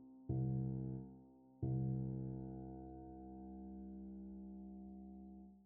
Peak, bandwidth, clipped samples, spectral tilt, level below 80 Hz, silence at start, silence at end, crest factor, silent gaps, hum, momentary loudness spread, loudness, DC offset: -30 dBFS; 1.6 kHz; under 0.1%; -13.5 dB/octave; -62 dBFS; 0 s; 0 s; 16 dB; none; none; 15 LU; -47 LUFS; under 0.1%